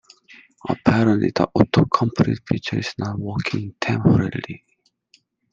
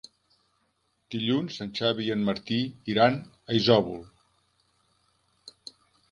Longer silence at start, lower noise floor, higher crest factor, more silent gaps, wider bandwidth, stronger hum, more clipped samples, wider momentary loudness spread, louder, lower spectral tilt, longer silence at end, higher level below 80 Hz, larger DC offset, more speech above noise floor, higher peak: second, 0.65 s vs 1.1 s; second, -60 dBFS vs -73 dBFS; about the same, 20 dB vs 24 dB; neither; second, 7.6 kHz vs 11 kHz; neither; neither; second, 11 LU vs 21 LU; first, -20 LUFS vs -26 LUFS; about the same, -7.5 dB/octave vs -6.5 dB/octave; first, 0.95 s vs 0.6 s; first, -48 dBFS vs -62 dBFS; neither; second, 40 dB vs 47 dB; first, -2 dBFS vs -6 dBFS